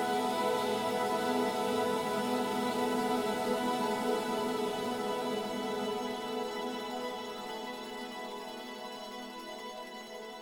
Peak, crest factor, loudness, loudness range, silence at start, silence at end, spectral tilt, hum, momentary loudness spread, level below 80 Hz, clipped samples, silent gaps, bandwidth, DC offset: -20 dBFS; 14 dB; -34 LUFS; 9 LU; 0 s; 0 s; -4 dB/octave; none; 11 LU; -70 dBFS; under 0.1%; none; over 20 kHz; under 0.1%